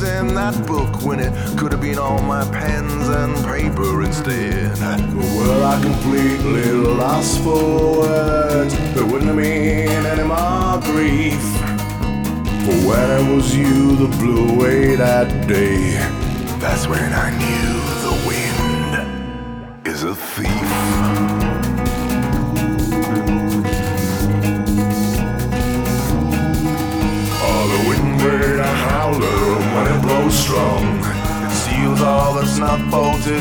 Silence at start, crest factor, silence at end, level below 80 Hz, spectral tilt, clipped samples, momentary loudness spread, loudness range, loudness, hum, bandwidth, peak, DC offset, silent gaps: 0 s; 16 dB; 0 s; -28 dBFS; -5.5 dB/octave; under 0.1%; 6 LU; 4 LU; -17 LUFS; none; over 20 kHz; -2 dBFS; under 0.1%; none